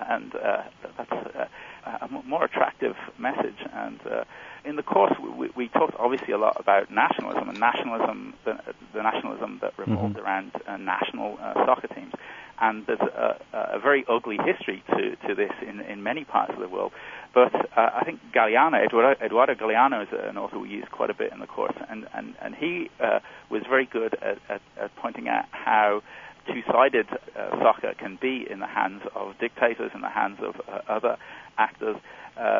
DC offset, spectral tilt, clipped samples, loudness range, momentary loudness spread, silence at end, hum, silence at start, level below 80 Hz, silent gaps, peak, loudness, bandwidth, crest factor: under 0.1%; -6.5 dB/octave; under 0.1%; 7 LU; 14 LU; 0 s; none; 0 s; -66 dBFS; none; -6 dBFS; -26 LUFS; 7.4 kHz; 20 dB